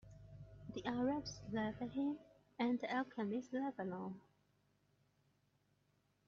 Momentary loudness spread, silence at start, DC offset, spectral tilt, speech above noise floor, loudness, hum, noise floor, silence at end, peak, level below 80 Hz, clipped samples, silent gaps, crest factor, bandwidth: 18 LU; 0.05 s; under 0.1%; -5 dB/octave; 38 dB; -43 LUFS; 50 Hz at -65 dBFS; -79 dBFS; 2.1 s; -24 dBFS; -70 dBFS; under 0.1%; none; 20 dB; 7.4 kHz